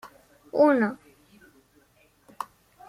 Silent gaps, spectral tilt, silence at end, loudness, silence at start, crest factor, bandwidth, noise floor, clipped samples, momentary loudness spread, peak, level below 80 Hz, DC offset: none; -7 dB/octave; 0.45 s; -23 LUFS; 0.05 s; 20 dB; 15 kHz; -62 dBFS; under 0.1%; 19 LU; -8 dBFS; -70 dBFS; under 0.1%